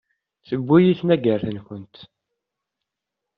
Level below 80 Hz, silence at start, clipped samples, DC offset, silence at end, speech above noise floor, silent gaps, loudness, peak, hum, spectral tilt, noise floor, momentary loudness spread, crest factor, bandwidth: -58 dBFS; 0.5 s; under 0.1%; under 0.1%; 1.35 s; 64 dB; none; -19 LUFS; -4 dBFS; none; -7 dB/octave; -84 dBFS; 20 LU; 18 dB; 5.2 kHz